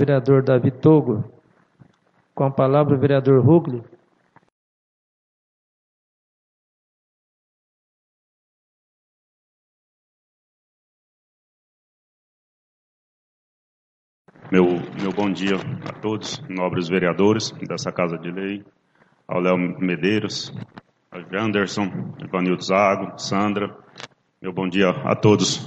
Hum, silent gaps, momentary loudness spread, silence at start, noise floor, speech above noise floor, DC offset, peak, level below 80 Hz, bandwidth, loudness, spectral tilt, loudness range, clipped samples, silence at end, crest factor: none; 4.52-14.25 s; 16 LU; 0 s; -62 dBFS; 42 dB; under 0.1%; -2 dBFS; -62 dBFS; 8.4 kHz; -20 LUFS; -6 dB/octave; 6 LU; under 0.1%; 0 s; 20 dB